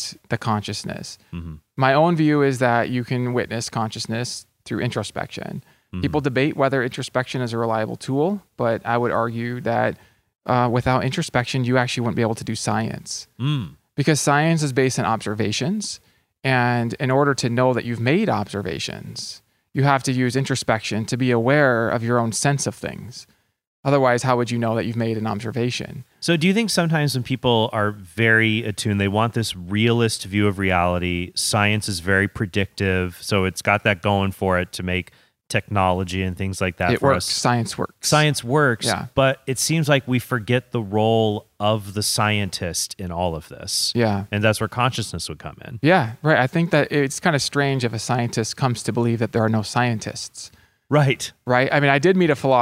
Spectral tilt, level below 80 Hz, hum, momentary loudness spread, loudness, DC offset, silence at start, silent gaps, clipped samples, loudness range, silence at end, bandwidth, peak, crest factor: -5 dB/octave; -52 dBFS; none; 11 LU; -21 LUFS; under 0.1%; 0 s; 23.67-23.83 s; under 0.1%; 3 LU; 0 s; 16 kHz; -2 dBFS; 20 dB